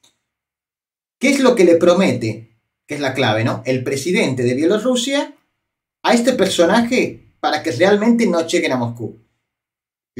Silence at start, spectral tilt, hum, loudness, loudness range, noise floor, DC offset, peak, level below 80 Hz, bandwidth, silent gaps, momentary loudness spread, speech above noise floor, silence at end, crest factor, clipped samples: 1.2 s; -5 dB/octave; none; -16 LUFS; 3 LU; under -90 dBFS; under 0.1%; 0 dBFS; -60 dBFS; 16 kHz; none; 11 LU; over 74 dB; 1.05 s; 16 dB; under 0.1%